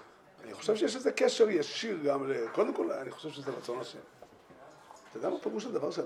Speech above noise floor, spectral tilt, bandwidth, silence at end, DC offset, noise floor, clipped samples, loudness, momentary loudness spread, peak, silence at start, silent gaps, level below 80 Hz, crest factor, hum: 23 dB; -4 dB/octave; 12.5 kHz; 0 s; under 0.1%; -55 dBFS; under 0.1%; -32 LUFS; 18 LU; -12 dBFS; 0 s; none; -80 dBFS; 20 dB; none